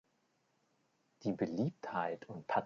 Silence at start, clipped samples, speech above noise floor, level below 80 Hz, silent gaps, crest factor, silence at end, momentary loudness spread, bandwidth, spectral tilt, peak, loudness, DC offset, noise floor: 1.2 s; under 0.1%; 40 dB; -78 dBFS; none; 22 dB; 0 s; 6 LU; 7.4 kHz; -6.5 dB/octave; -20 dBFS; -39 LUFS; under 0.1%; -78 dBFS